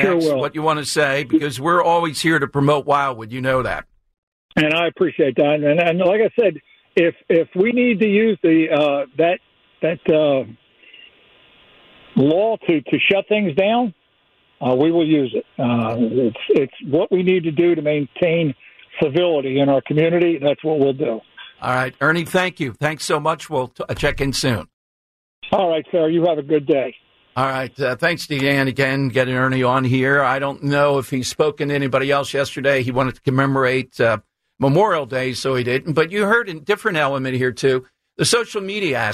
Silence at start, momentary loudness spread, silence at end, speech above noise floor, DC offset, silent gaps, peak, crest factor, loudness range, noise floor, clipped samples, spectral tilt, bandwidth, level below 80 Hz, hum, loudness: 0 s; 7 LU; 0 s; 42 dB; under 0.1%; 4.18-4.49 s, 24.73-25.42 s; -4 dBFS; 14 dB; 3 LU; -60 dBFS; under 0.1%; -5.5 dB/octave; 14 kHz; -48 dBFS; none; -18 LUFS